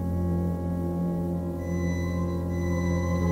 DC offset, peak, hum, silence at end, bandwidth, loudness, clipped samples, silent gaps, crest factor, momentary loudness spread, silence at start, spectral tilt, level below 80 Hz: under 0.1%; -14 dBFS; none; 0 s; 15.5 kHz; -28 LUFS; under 0.1%; none; 12 dB; 3 LU; 0 s; -8 dB/octave; -40 dBFS